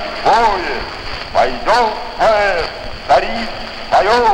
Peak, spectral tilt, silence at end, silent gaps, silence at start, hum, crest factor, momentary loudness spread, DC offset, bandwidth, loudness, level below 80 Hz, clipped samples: -2 dBFS; -3.5 dB/octave; 0 s; none; 0 s; none; 14 dB; 11 LU; under 0.1%; 15 kHz; -15 LUFS; -32 dBFS; under 0.1%